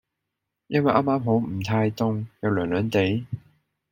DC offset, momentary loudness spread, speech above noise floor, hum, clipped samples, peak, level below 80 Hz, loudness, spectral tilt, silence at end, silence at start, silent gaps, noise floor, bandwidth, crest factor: under 0.1%; 7 LU; 59 dB; none; under 0.1%; -4 dBFS; -58 dBFS; -24 LUFS; -7.5 dB/octave; 0.5 s; 0.7 s; none; -82 dBFS; 16.5 kHz; 22 dB